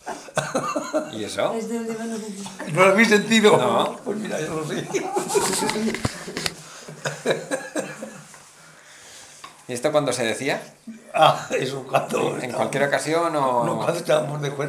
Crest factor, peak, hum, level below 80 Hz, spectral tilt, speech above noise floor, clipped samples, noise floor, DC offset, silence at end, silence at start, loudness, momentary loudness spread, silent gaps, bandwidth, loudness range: 22 dB; -2 dBFS; none; -56 dBFS; -4 dB/octave; 26 dB; under 0.1%; -48 dBFS; under 0.1%; 0 s; 0.05 s; -22 LUFS; 18 LU; none; 16 kHz; 9 LU